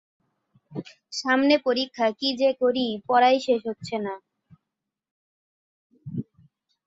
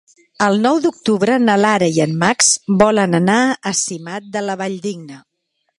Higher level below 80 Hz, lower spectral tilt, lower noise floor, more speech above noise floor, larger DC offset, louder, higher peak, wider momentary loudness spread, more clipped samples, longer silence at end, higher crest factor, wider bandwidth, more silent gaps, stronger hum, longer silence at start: second, -70 dBFS vs -56 dBFS; about the same, -4.5 dB/octave vs -4 dB/octave; first, -85 dBFS vs -70 dBFS; first, 62 dB vs 55 dB; neither; second, -23 LUFS vs -15 LUFS; second, -6 dBFS vs 0 dBFS; first, 18 LU vs 11 LU; neither; about the same, 0.65 s vs 0.6 s; about the same, 20 dB vs 16 dB; second, 7.8 kHz vs 11.5 kHz; first, 5.11-5.90 s vs none; neither; first, 0.7 s vs 0.4 s